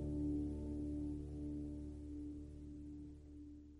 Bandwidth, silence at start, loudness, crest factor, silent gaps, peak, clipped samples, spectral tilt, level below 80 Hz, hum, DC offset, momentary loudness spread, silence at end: 11 kHz; 0 s; -47 LUFS; 14 dB; none; -32 dBFS; under 0.1%; -10 dB/octave; -52 dBFS; none; under 0.1%; 14 LU; 0 s